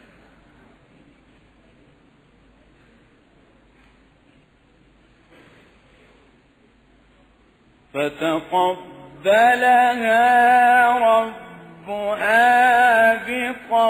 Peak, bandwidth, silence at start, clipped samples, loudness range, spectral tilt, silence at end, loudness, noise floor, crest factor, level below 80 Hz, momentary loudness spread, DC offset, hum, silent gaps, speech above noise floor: -6 dBFS; 15.5 kHz; 7.95 s; under 0.1%; 13 LU; -3.5 dB/octave; 0 s; -17 LUFS; -56 dBFS; 16 dB; -60 dBFS; 15 LU; under 0.1%; none; none; 40 dB